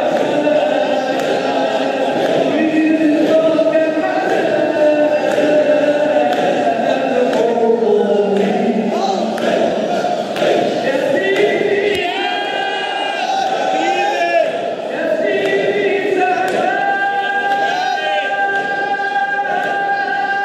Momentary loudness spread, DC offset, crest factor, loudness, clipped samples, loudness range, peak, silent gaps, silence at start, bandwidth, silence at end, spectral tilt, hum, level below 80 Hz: 4 LU; under 0.1%; 12 dB; -15 LUFS; under 0.1%; 2 LU; -2 dBFS; none; 0 s; 13.5 kHz; 0 s; -4.5 dB/octave; none; -64 dBFS